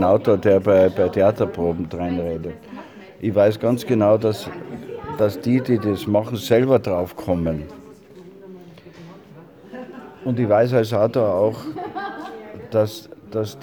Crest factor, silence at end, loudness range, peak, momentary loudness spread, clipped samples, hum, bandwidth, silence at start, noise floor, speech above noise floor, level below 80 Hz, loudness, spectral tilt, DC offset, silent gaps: 18 dB; 0 s; 6 LU; -2 dBFS; 20 LU; under 0.1%; none; 20 kHz; 0 s; -44 dBFS; 25 dB; -50 dBFS; -20 LUFS; -7.5 dB/octave; under 0.1%; none